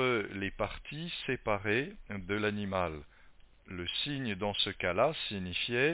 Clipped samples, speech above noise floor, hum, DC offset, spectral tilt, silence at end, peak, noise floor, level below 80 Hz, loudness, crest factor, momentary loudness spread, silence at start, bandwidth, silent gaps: under 0.1%; 24 dB; none; under 0.1%; -3 dB/octave; 0 s; -14 dBFS; -58 dBFS; -54 dBFS; -34 LUFS; 20 dB; 10 LU; 0 s; 4 kHz; none